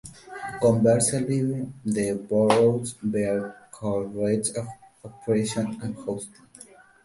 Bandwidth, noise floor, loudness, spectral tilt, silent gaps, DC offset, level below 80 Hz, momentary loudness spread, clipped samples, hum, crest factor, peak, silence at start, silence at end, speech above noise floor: 11.5 kHz; -50 dBFS; -25 LUFS; -5.5 dB/octave; none; under 0.1%; -58 dBFS; 17 LU; under 0.1%; none; 22 dB; -2 dBFS; 0.05 s; 0.4 s; 26 dB